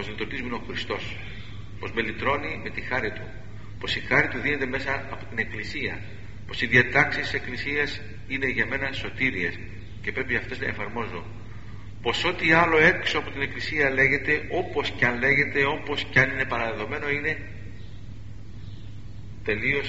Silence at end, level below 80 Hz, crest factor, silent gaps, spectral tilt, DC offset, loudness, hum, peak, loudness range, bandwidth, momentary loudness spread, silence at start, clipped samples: 0 s; -46 dBFS; 24 dB; none; -3 dB/octave; 1%; -25 LUFS; none; -2 dBFS; 8 LU; 8 kHz; 22 LU; 0 s; under 0.1%